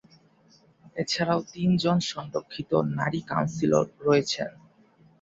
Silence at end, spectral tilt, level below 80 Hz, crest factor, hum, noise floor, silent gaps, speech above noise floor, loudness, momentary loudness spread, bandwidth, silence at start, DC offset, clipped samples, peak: 0.7 s; -5.5 dB/octave; -62 dBFS; 20 dB; none; -60 dBFS; none; 34 dB; -26 LUFS; 10 LU; 8 kHz; 0.85 s; under 0.1%; under 0.1%; -8 dBFS